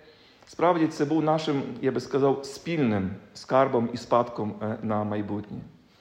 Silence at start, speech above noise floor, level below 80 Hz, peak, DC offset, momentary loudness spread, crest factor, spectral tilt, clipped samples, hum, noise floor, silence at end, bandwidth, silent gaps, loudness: 0.5 s; 28 dB; -66 dBFS; -8 dBFS; under 0.1%; 11 LU; 18 dB; -7 dB/octave; under 0.1%; none; -54 dBFS; 0.3 s; 10.5 kHz; none; -26 LUFS